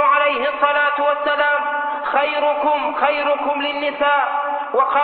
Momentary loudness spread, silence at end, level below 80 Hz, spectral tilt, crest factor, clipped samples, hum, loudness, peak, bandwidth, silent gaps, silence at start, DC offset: 4 LU; 0 s; -62 dBFS; -6.5 dB/octave; 14 dB; under 0.1%; none; -18 LUFS; -4 dBFS; 4.6 kHz; none; 0 s; under 0.1%